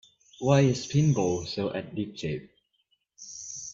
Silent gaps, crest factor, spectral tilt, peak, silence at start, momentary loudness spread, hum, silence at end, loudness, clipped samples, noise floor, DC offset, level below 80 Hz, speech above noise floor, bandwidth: none; 20 dB; -6 dB/octave; -8 dBFS; 0.4 s; 16 LU; none; 0 s; -27 LUFS; under 0.1%; -73 dBFS; under 0.1%; -60 dBFS; 48 dB; 7.6 kHz